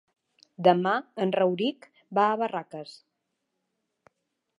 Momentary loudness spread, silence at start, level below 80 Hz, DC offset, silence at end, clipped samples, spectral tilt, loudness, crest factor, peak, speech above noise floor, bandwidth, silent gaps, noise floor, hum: 16 LU; 0.6 s; -82 dBFS; under 0.1%; 1.65 s; under 0.1%; -7 dB/octave; -26 LUFS; 22 dB; -6 dBFS; 55 dB; 11 kHz; none; -80 dBFS; none